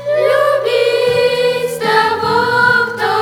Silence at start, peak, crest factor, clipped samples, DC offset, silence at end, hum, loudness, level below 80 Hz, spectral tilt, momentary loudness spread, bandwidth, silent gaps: 0 s; 0 dBFS; 14 dB; under 0.1%; under 0.1%; 0 s; none; -13 LUFS; -52 dBFS; -3.5 dB/octave; 4 LU; 18 kHz; none